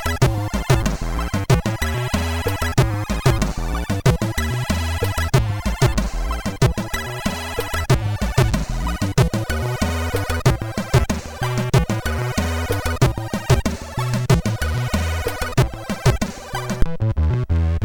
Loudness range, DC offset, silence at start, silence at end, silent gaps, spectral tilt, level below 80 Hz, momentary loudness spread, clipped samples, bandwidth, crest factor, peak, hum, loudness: 1 LU; 0.1%; 0 s; 0 s; none; -5.5 dB/octave; -26 dBFS; 6 LU; under 0.1%; 19 kHz; 18 dB; -2 dBFS; none; -21 LUFS